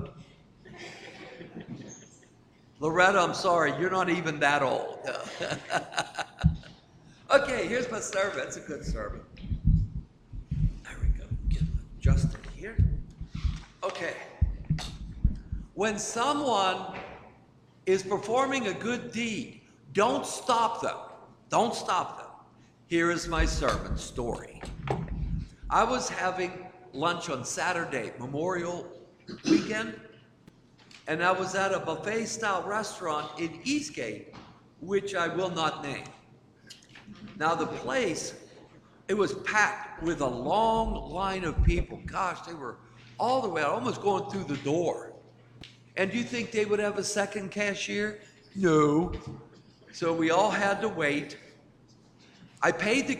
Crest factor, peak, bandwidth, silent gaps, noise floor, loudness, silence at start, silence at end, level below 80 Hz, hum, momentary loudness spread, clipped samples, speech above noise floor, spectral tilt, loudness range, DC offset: 22 dB; -8 dBFS; 14 kHz; none; -58 dBFS; -29 LUFS; 0 s; 0 s; -40 dBFS; none; 18 LU; under 0.1%; 30 dB; -5 dB/octave; 5 LU; under 0.1%